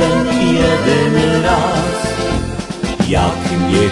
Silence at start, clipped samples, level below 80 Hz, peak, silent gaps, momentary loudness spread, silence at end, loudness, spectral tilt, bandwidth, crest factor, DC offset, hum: 0 s; under 0.1%; -30 dBFS; 0 dBFS; none; 7 LU; 0 s; -15 LUFS; -5.5 dB/octave; 11.5 kHz; 14 dB; under 0.1%; none